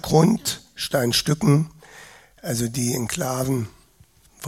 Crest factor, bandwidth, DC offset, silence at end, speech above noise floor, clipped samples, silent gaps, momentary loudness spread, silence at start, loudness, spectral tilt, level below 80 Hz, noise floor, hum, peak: 22 dB; 16.5 kHz; under 0.1%; 0 s; 34 dB; under 0.1%; none; 10 LU; 0.05 s; -22 LUFS; -5 dB/octave; -50 dBFS; -55 dBFS; none; -2 dBFS